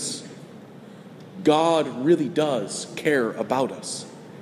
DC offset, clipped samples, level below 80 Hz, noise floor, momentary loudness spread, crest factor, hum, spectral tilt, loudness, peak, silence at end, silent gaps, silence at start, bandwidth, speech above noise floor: under 0.1%; under 0.1%; -72 dBFS; -43 dBFS; 23 LU; 18 dB; none; -4.5 dB/octave; -23 LUFS; -6 dBFS; 0 s; none; 0 s; 13.5 kHz; 21 dB